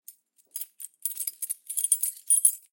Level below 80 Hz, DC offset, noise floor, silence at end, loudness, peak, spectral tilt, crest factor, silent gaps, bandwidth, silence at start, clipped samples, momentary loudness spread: under -90 dBFS; under 0.1%; -54 dBFS; 0.15 s; -25 LUFS; -4 dBFS; 7.5 dB/octave; 26 dB; none; 17.5 kHz; 0.1 s; under 0.1%; 17 LU